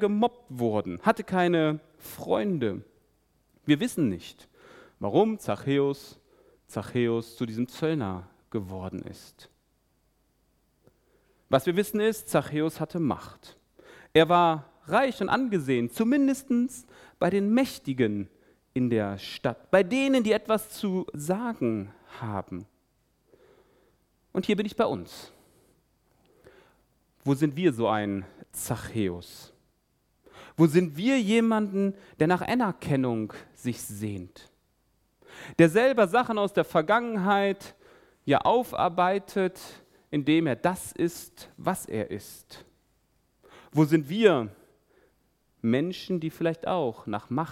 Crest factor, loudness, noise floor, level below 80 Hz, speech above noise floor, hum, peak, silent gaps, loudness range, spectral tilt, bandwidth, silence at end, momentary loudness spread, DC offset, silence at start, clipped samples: 22 dB; -27 LUFS; -71 dBFS; -62 dBFS; 45 dB; none; -6 dBFS; none; 8 LU; -6 dB/octave; 16.5 kHz; 0 s; 16 LU; under 0.1%; 0 s; under 0.1%